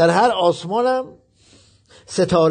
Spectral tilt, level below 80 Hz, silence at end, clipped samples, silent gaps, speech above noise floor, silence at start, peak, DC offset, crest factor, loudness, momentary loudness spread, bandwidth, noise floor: -5.5 dB/octave; -52 dBFS; 0 s; under 0.1%; none; 36 dB; 0 s; -4 dBFS; under 0.1%; 16 dB; -18 LUFS; 11 LU; 9.4 kHz; -52 dBFS